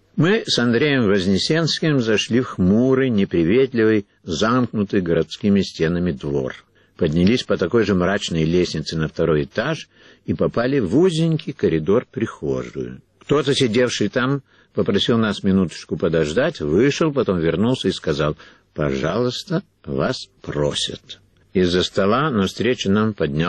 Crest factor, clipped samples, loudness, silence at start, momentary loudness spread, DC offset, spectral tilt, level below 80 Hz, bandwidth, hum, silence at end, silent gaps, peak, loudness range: 12 dB; under 0.1%; -20 LUFS; 0.15 s; 9 LU; under 0.1%; -6 dB/octave; -46 dBFS; 9.8 kHz; none; 0 s; none; -6 dBFS; 4 LU